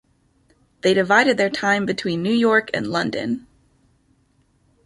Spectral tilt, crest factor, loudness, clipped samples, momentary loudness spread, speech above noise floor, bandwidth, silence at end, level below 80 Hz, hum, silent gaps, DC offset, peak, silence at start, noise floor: -5 dB/octave; 20 dB; -19 LUFS; under 0.1%; 9 LU; 43 dB; 11.5 kHz; 1.45 s; -60 dBFS; none; none; under 0.1%; -2 dBFS; 0.85 s; -62 dBFS